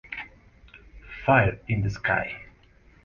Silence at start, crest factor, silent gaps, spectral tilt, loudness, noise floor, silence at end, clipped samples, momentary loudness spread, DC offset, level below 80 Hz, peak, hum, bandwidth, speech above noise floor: 0.1 s; 22 dB; none; -7.5 dB/octave; -25 LUFS; -56 dBFS; 0.6 s; under 0.1%; 20 LU; under 0.1%; -46 dBFS; -6 dBFS; none; 7 kHz; 32 dB